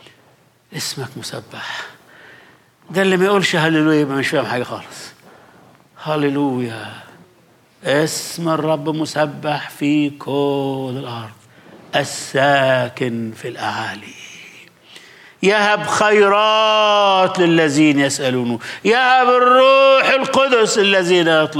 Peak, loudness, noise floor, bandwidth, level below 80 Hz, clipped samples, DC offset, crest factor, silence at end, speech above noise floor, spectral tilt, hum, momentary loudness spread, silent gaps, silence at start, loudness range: -2 dBFS; -15 LUFS; -53 dBFS; 16 kHz; -66 dBFS; under 0.1%; under 0.1%; 14 dB; 0 s; 37 dB; -4.5 dB/octave; none; 17 LU; none; 0.7 s; 9 LU